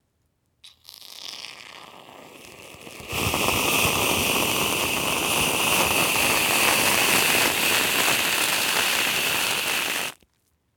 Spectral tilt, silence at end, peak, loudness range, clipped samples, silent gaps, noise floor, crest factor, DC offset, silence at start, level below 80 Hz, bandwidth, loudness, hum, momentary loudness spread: -1 dB/octave; 0.65 s; -4 dBFS; 9 LU; under 0.1%; none; -70 dBFS; 20 dB; under 0.1%; 0.65 s; -50 dBFS; over 20 kHz; -20 LUFS; none; 18 LU